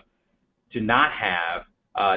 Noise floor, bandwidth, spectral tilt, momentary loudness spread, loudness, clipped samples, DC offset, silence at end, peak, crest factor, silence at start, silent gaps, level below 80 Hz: -71 dBFS; 5.2 kHz; -8.5 dB/octave; 14 LU; -23 LUFS; under 0.1%; under 0.1%; 0 s; -4 dBFS; 22 dB; 0.75 s; none; -54 dBFS